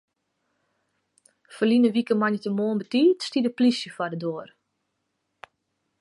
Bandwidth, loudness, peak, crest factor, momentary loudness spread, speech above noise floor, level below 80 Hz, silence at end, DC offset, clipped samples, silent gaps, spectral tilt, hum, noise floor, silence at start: 11 kHz; -24 LUFS; -10 dBFS; 16 dB; 10 LU; 54 dB; -76 dBFS; 1.55 s; under 0.1%; under 0.1%; none; -6 dB/octave; none; -77 dBFS; 1.5 s